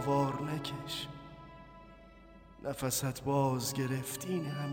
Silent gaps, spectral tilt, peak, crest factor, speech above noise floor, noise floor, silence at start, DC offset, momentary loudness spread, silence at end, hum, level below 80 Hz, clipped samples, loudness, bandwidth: none; -5 dB/octave; -20 dBFS; 16 dB; 21 dB; -56 dBFS; 0 s; under 0.1%; 21 LU; 0 s; none; -60 dBFS; under 0.1%; -35 LUFS; 17 kHz